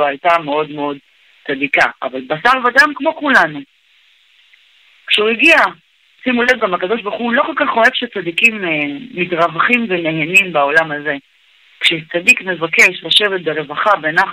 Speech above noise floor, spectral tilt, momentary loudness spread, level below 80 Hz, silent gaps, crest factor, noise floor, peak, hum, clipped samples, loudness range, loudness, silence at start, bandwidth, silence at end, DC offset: 38 dB; -3 dB/octave; 11 LU; -58 dBFS; none; 16 dB; -53 dBFS; 0 dBFS; none; under 0.1%; 2 LU; -13 LUFS; 0 s; 16 kHz; 0 s; under 0.1%